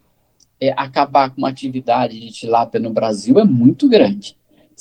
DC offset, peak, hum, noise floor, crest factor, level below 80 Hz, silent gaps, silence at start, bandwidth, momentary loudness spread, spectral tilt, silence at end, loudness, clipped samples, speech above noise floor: under 0.1%; 0 dBFS; none; -58 dBFS; 16 dB; -60 dBFS; none; 0.6 s; 9.8 kHz; 11 LU; -7 dB/octave; 0.5 s; -16 LUFS; under 0.1%; 43 dB